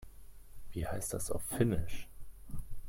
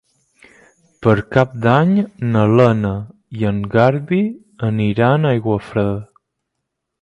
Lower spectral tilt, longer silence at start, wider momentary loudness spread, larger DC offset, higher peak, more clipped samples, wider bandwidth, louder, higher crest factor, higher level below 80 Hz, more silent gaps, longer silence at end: second, -5.5 dB/octave vs -9 dB/octave; second, 0 s vs 1 s; first, 22 LU vs 10 LU; neither; second, -18 dBFS vs 0 dBFS; neither; first, 16.5 kHz vs 7.8 kHz; second, -37 LUFS vs -16 LUFS; about the same, 18 dB vs 16 dB; about the same, -46 dBFS vs -46 dBFS; neither; second, 0 s vs 0.95 s